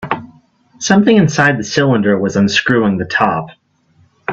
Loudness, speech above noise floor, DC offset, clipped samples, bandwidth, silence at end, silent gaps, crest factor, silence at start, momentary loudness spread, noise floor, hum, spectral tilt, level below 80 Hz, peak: -13 LUFS; 41 dB; under 0.1%; under 0.1%; 7.8 kHz; 0 s; none; 14 dB; 0 s; 13 LU; -53 dBFS; none; -5 dB/octave; -50 dBFS; 0 dBFS